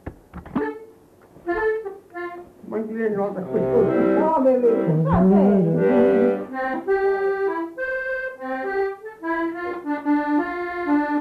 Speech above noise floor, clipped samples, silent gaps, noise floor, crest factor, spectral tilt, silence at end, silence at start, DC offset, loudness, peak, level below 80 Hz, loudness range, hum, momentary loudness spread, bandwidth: 31 dB; under 0.1%; none; -50 dBFS; 16 dB; -9.5 dB/octave; 0 s; 0.05 s; under 0.1%; -21 LUFS; -6 dBFS; -48 dBFS; 8 LU; none; 14 LU; 5 kHz